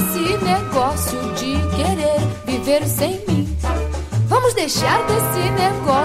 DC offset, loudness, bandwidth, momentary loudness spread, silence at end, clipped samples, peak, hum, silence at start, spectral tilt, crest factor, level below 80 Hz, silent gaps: under 0.1%; -19 LUFS; 16 kHz; 6 LU; 0 s; under 0.1%; -2 dBFS; none; 0 s; -5 dB/octave; 16 dB; -32 dBFS; none